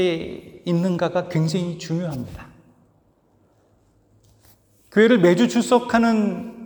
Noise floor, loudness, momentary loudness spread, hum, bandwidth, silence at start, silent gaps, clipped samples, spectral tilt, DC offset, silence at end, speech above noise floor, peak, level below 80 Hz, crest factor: -60 dBFS; -20 LUFS; 17 LU; none; over 20 kHz; 0 s; none; under 0.1%; -6.5 dB/octave; under 0.1%; 0 s; 41 dB; -2 dBFS; -56 dBFS; 18 dB